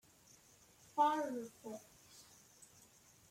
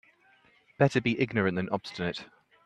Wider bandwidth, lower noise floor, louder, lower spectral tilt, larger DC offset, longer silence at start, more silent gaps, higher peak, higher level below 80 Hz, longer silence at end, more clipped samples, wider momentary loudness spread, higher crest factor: first, 16.5 kHz vs 10 kHz; about the same, -66 dBFS vs -63 dBFS; second, -39 LUFS vs -29 LUFS; second, -3.5 dB/octave vs -6.5 dB/octave; neither; first, 0.95 s vs 0.8 s; neither; second, -22 dBFS vs -8 dBFS; second, -82 dBFS vs -64 dBFS; first, 0.65 s vs 0.4 s; neither; first, 28 LU vs 9 LU; about the same, 20 dB vs 22 dB